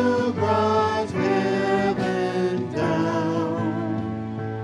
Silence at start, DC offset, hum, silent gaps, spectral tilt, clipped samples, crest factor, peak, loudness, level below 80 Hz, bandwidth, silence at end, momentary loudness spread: 0 s; under 0.1%; none; none; -7 dB/octave; under 0.1%; 14 dB; -8 dBFS; -23 LUFS; -58 dBFS; 11.5 kHz; 0 s; 6 LU